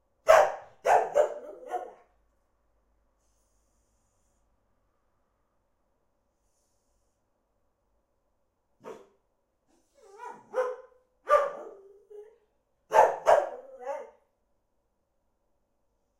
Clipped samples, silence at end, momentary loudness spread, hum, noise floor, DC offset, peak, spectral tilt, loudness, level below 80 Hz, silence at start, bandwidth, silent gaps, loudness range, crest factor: under 0.1%; 2.15 s; 26 LU; none; -76 dBFS; under 0.1%; -4 dBFS; -2 dB/octave; -26 LUFS; -68 dBFS; 0.25 s; 15.5 kHz; none; 13 LU; 28 dB